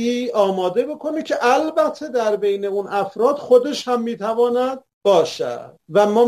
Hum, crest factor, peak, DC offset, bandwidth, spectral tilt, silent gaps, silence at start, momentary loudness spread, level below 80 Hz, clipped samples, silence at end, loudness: none; 16 dB; -2 dBFS; under 0.1%; 13.5 kHz; -5 dB/octave; 4.93-5.01 s; 0 s; 8 LU; -68 dBFS; under 0.1%; 0 s; -19 LUFS